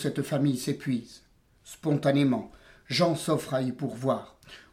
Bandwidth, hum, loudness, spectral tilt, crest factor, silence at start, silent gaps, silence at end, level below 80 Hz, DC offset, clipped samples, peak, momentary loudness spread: 16 kHz; none; -28 LUFS; -6 dB/octave; 18 dB; 0 s; none; 0.15 s; -64 dBFS; under 0.1%; under 0.1%; -12 dBFS; 9 LU